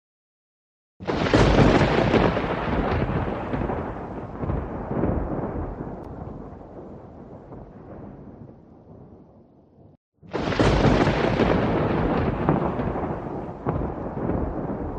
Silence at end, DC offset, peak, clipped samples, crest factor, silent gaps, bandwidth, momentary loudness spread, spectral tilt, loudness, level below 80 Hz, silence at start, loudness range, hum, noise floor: 0 s; under 0.1%; -4 dBFS; under 0.1%; 20 dB; 9.97-10.12 s; 9.4 kHz; 22 LU; -7 dB/octave; -24 LUFS; -34 dBFS; 1 s; 20 LU; none; -53 dBFS